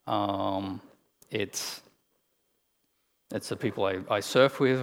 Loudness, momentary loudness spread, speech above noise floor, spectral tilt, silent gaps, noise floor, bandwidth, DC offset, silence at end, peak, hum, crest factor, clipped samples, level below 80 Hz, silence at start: -29 LUFS; 15 LU; 44 dB; -4.5 dB/octave; none; -73 dBFS; over 20 kHz; under 0.1%; 0 s; -6 dBFS; none; 24 dB; under 0.1%; -78 dBFS; 0.05 s